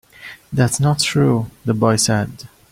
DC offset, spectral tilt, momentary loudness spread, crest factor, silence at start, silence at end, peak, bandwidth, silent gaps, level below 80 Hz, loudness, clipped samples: under 0.1%; -5 dB/octave; 12 LU; 16 dB; 0.2 s; 0.25 s; -2 dBFS; 16 kHz; none; -48 dBFS; -17 LUFS; under 0.1%